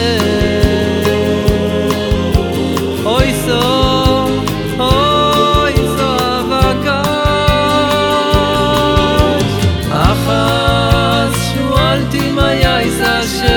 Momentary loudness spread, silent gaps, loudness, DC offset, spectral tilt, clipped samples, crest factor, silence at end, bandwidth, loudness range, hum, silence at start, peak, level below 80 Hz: 4 LU; none; -12 LUFS; under 0.1%; -5.5 dB/octave; under 0.1%; 12 dB; 0 s; over 20 kHz; 2 LU; none; 0 s; 0 dBFS; -22 dBFS